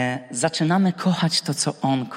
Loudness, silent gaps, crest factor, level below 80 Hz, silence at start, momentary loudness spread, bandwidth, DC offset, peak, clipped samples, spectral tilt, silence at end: -22 LUFS; none; 16 dB; -68 dBFS; 0 s; 4 LU; 15.5 kHz; under 0.1%; -6 dBFS; under 0.1%; -4.5 dB/octave; 0 s